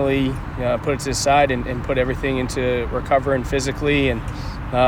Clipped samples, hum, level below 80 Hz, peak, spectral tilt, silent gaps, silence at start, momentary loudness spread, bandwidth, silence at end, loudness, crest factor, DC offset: under 0.1%; none; -32 dBFS; -4 dBFS; -5 dB/octave; none; 0 s; 7 LU; 17.5 kHz; 0 s; -21 LUFS; 16 dB; under 0.1%